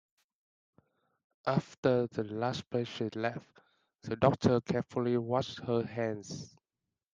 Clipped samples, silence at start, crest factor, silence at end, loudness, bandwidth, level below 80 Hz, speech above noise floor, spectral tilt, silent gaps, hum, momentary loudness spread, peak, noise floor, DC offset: under 0.1%; 1.45 s; 24 dB; 0.65 s; -33 LUFS; 9.2 kHz; -68 dBFS; 57 dB; -7 dB/octave; 1.77-1.83 s; none; 12 LU; -10 dBFS; -89 dBFS; under 0.1%